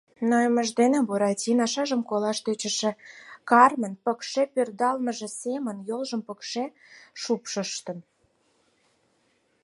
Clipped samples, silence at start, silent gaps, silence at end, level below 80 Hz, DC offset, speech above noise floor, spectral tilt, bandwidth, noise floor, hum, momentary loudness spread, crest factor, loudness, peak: under 0.1%; 0.2 s; none; 1.6 s; -80 dBFS; under 0.1%; 43 dB; -3.5 dB/octave; 11.5 kHz; -68 dBFS; none; 13 LU; 24 dB; -25 LUFS; -2 dBFS